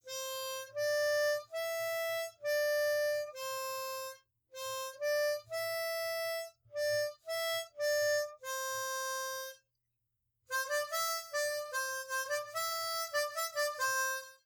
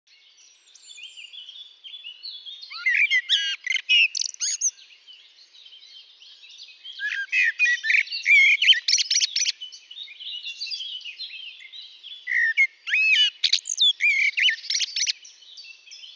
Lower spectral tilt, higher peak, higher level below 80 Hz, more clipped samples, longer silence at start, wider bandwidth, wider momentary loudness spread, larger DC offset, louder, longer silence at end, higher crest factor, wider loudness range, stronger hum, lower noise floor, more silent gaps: first, 1.5 dB/octave vs 10.5 dB/octave; second, -22 dBFS vs -6 dBFS; first, -82 dBFS vs under -90 dBFS; neither; second, 0.05 s vs 0.85 s; first, over 20 kHz vs 8 kHz; second, 8 LU vs 23 LU; neither; second, -35 LUFS vs -20 LUFS; about the same, 0.1 s vs 0.05 s; about the same, 14 dB vs 18 dB; second, 3 LU vs 9 LU; neither; first, -84 dBFS vs -55 dBFS; neither